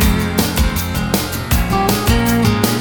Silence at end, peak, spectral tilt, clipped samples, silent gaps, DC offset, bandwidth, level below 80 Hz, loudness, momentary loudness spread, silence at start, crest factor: 0 s; -2 dBFS; -5 dB/octave; under 0.1%; none; 0.2%; over 20 kHz; -22 dBFS; -16 LUFS; 4 LU; 0 s; 14 dB